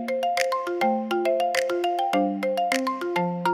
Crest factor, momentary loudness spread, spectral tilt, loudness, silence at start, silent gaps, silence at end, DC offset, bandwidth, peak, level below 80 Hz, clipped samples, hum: 20 dB; 2 LU; -4.5 dB/octave; -25 LUFS; 0 s; none; 0 s; under 0.1%; 17 kHz; -4 dBFS; -76 dBFS; under 0.1%; none